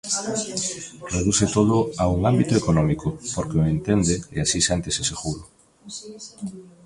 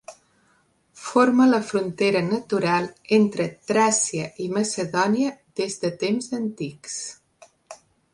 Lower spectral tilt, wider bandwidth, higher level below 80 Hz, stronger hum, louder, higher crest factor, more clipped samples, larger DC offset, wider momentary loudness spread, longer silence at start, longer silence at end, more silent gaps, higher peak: about the same, -4.5 dB/octave vs -4.5 dB/octave; about the same, 11.5 kHz vs 11.5 kHz; first, -40 dBFS vs -66 dBFS; neither; about the same, -22 LUFS vs -23 LUFS; about the same, 18 dB vs 18 dB; neither; neither; first, 16 LU vs 12 LU; about the same, 0.05 s vs 0.1 s; second, 0.15 s vs 0.4 s; neither; about the same, -6 dBFS vs -4 dBFS